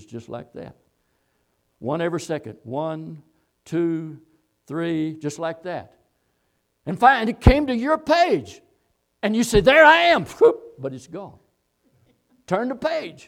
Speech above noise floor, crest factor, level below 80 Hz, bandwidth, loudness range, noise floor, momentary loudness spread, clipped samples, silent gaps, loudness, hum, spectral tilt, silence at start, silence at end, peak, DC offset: 50 dB; 22 dB; -36 dBFS; 16 kHz; 13 LU; -70 dBFS; 21 LU; under 0.1%; none; -20 LUFS; none; -5.5 dB/octave; 0.1 s; 0.15 s; 0 dBFS; under 0.1%